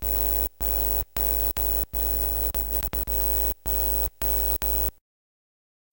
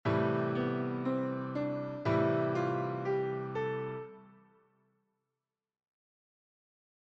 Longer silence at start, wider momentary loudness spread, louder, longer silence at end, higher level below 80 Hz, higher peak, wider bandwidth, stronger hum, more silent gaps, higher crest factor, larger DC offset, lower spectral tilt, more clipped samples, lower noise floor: about the same, 0 s vs 0.05 s; second, 3 LU vs 6 LU; first, -23 LUFS vs -34 LUFS; second, 1 s vs 2.75 s; first, -32 dBFS vs -68 dBFS; first, -8 dBFS vs -18 dBFS; first, 17.5 kHz vs 7.2 kHz; first, 50 Hz at -35 dBFS vs none; neither; about the same, 18 dB vs 16 dB; first, 0.2% vs under 0.1%; second, -4 dB/octave vs -8.5 dB/octave; neither; about the same, under -90 dBFS vs under -90 dBFS